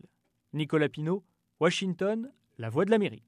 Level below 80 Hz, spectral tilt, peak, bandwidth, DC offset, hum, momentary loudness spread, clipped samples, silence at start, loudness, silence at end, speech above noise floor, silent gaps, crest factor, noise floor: -76 dBFS; -6 dB/octave; -12 dBFS; 11.5 kHz; under 0.1%; none; 12 LU; under 0.1%; 0.55 s; -30 LUFS; 0.1 s; 35 dB; none; 18 dB; -64 dBFS